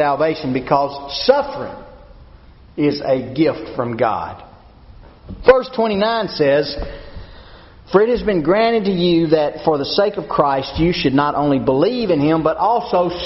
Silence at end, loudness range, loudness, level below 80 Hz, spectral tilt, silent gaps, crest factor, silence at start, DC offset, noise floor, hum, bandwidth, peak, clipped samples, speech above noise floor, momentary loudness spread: 0 s; 5 LU; -17 LUFS; -40 dBFS; -4.5 dB/octave; none; 18 dB; 0 s; under 0.1%; -43 dBFS; none; 6 kHz; 0 dBFS; under 0.1%; 26 dB; 11 LU